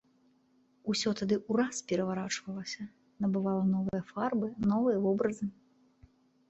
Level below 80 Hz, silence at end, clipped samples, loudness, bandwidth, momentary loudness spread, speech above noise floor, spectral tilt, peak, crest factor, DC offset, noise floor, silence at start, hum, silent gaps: -66 dBFS; 1 s; under 0.1%; -32 LUFS; 8.2 kHz; 11 LU; 37 dB; -5.5 dB/octave; -16 dBFS; 16 dB; under 0.1%; -68 dBFS; 0.85 s; none; none